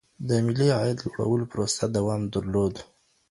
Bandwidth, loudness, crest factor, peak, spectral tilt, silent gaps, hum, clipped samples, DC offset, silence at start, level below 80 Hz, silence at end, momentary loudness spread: 11.5 kHz; -26 LUFS; 16 dB; -10 dBFS; -6 dB/octave; none; none; under 0.1%; under 0.1%; 0.2 s; -50 dBFS; 0.45 s; 6 LU